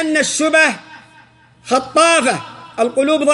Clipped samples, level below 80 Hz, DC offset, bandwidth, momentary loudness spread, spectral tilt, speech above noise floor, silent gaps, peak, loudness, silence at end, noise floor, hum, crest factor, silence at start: under 0.1%; -60 dBFS; under 0.1%; 11.5 kHz; 11 LU; -2 dB/octave; 33 dB; none; -2 dBFS; -14 LUFS; 0 s; -47 dBFS; none; 14 dB; 0 s